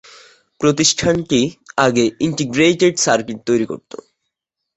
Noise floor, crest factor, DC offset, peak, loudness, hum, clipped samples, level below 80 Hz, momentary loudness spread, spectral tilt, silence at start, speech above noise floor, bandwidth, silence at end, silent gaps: -78 dBFS; 16 dB; under 0.1%; -2 dBFS; -16 LUFS; none; under 0.1%; -50 dBFS; 9 LU; -4 dB/octave; 0.6 s; 62 dB; 8.2 kHz; 0.95 s; none